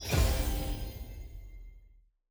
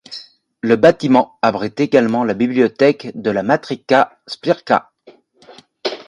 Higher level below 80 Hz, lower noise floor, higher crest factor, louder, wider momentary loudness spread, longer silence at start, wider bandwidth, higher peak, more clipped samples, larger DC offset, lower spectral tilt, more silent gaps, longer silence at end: first, -36 dBFS vs -60 dBFS; first, -61 dBFS vs -48 dBFS; about the same, 18 dB vs 16 dB; second, -33 LUFS vs -16 LUFS; first, 22 LU vs 13 LU; about the same, 0 s vs 0.1 s; first, over 20 kHz vs 10.5 kHz; second, -16 dBFS vs 0 dBFS; neither; neither; second, -4.5 dB/octave vs -6.5 dB/octave; neither; first, 0.45 s vs 0.05 s